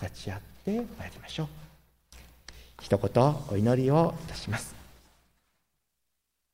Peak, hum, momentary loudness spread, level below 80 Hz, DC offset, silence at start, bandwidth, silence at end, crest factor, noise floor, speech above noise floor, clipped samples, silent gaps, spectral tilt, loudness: -10 dBFS; none; 23 LU; -54 dBFS; under 0.1%; 0 s; 16 kHz; 1.7 s; 22 dB; -82 dBFS; 53 dB; under 0.1%; none; -7 dB/octave; -29 LUFS